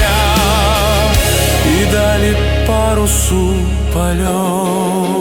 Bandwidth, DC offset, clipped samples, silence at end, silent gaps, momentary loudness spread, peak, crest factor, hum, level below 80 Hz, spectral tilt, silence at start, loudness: 18 kHz; under 0.1%; under 0.1%; 0 s; none; 4 LU; 0 dBFS; 12 dB; none; -18 dBFS; -4.5 dB/octave; 0 s; -13 LUFS